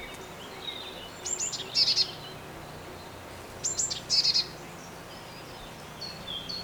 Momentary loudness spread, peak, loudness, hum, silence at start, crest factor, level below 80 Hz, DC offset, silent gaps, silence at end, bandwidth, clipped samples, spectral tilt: 20 LU; -12 dBFS; -28 LUFS; none; 0 s; 22 dB; -58 dBFS; under 0.1%; none; 0 s; over 20 kHz; under 0.1%; -0.5 dB/octave